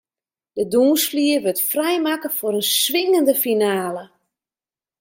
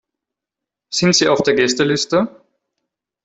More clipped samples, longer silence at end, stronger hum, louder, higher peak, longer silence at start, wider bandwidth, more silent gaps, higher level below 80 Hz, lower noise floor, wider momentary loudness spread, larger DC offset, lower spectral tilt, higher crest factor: neither; about the same, 0.95 s vs 0.95 s; neither; about the same, -18 LUFS vs -16 LUFS; second, -4 dBFS vs 0 dBFS; second, 0.55 s vs 0.9 s; first, 16.5 kHz vs 8.4 kHz; neither; second, -68 dBFS vs -56 dBFS; first, under -90 dBFS vs -85 dBFS; about the same, 9 LU vs 7 LU; neither; about the same, -2.5 dB/octave vs -3.5 dB/octave; about the same, 16 dB vs 18 dB